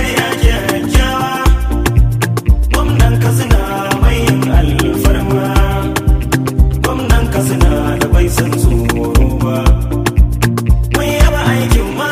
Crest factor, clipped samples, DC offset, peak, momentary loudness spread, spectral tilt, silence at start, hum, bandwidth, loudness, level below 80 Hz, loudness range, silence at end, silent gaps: 10 dB; under 0.1%; under 0.1%; 0 dBFS; 3 LU; -5.5 dB/octave; 0 s; none; 16 kHz; -13 LUFS; -14 dBFS; 1 LU; 0 s; none